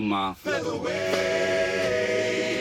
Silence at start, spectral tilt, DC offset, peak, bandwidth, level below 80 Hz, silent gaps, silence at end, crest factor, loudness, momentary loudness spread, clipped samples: 0 s; -4 dB/octave; under 0.1%; -12 dBFS; 18 kHz; -58 dBFS; none; 0 s; 14 dB; -25 LUFS; 4 LU; under 0.1%